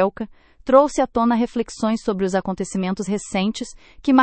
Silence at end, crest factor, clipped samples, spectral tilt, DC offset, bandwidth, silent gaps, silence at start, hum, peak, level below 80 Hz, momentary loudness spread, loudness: 0 s; 20 dB; under 0.1%; -5.5 dB/octave; under 0.1%; 8.8 kHz; none; 0 s; none; 0 dBFS; -48 dBFS; 16 LU; -21 LUFS